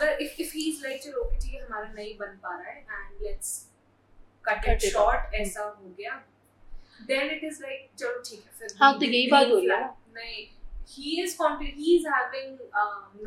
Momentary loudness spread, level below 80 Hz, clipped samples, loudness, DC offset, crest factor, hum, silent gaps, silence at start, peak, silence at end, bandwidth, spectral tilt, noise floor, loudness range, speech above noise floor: 19 LU; -38 dBFS; under 0.1%; -27 LUFS; under 0.1%; 24 dB; none; none; 0 s; -4 dBFS; 0 s; 16.5 kHz; -3 dB/octave; -56 dBFS; 11 LU; 28 dB